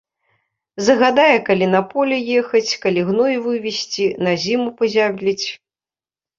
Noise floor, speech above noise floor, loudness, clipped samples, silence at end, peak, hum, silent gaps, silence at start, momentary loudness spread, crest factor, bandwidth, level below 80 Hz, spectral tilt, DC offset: under -90 dBFS; over 73 dB; -17 LUFS; under 0.1%; 0.85 s; -2 dBFS; none; none; 0.75 s; 8 LU; 16 dB; 7.6 kHz; -62 dBFS; -4.5 dB/octave; under 0.1%